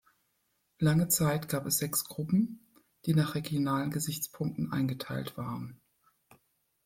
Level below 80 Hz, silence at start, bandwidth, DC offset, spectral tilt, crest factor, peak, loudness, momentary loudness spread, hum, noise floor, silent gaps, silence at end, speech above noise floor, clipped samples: -62 dBFS; 0.8 s; 16.5 kHz; under 0.1%; -5 dB/octave; 18 dB; -14 dBFS; -31 LUFS; 11 LU; none; -77 dBFS; none; 1.1 s; 46 dB; under 0.1%